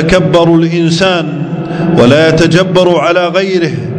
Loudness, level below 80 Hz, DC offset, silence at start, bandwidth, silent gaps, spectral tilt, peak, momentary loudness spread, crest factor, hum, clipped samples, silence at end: -9 LUFS; -34 dBFS; under 0.1%; 0 s; 11 kHz; none; -6 dB/octave; 0 dBFS; 8 LU; 8 dB; none; 3%; 0 s